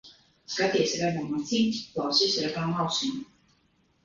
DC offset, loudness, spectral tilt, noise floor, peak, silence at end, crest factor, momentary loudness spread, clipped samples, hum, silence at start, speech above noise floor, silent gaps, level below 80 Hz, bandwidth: under 0.1%; -27 LUFS; -4 dB/octave; -67 dBFS; -10 dBFS; 0.8 s; 18 dB; 8 LU; under 0.1%; none; 0.05 s; 40 dB; none; -64 dBFS; 7.6 kHz